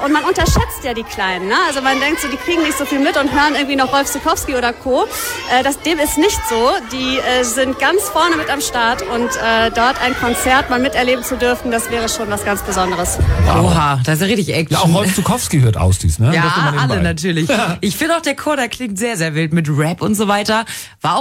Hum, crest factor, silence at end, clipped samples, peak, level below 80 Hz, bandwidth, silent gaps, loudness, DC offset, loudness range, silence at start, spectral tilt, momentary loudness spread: none; 14 dB; 0 s; under 0.1%; -2 dBFS; -30 dBFS; 16.5 kHz; none; -15 LUFS; under 0.1%; 2 LU; 0 s; -4.5 dB/octave; 5 LU